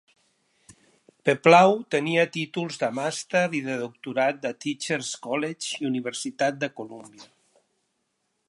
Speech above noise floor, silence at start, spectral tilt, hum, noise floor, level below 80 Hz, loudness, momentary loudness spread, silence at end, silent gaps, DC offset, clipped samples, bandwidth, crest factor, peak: 51 dB; 1.25 s; -4.5 dB/octave; none; -76 dBFS; -78 dBFS; -24 LUFS; 15 LU; 1.25 s; none; under 0.1%; under 0.1%; 11.5 kHz; 24 dB; -2 dBFS